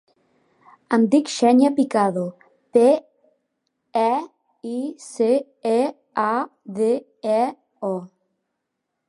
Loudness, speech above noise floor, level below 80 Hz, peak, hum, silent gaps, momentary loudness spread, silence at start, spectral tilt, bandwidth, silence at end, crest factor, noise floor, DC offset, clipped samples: -21 LUFS; 59 dB; -76 dBFS; -4 dBFS; none; none; 14 LU; 0.9 s; -5.5 dB/octave; 11.5 kHz; 1.05 s; 18 dB; -79 dBFS; under 0.1%; under 0.1%